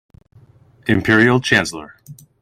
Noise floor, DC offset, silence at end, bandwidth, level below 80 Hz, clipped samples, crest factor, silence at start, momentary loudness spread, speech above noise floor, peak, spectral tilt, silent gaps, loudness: -49 dBFS; under 0.1%; 0.3 s; 15.5 kHz; -48 dBFS; under 0.1%; 18 dB; 0.85 s; 15 LU; 33 dB; -2 dBFS; -5 dB/octave; none; -15 LUFS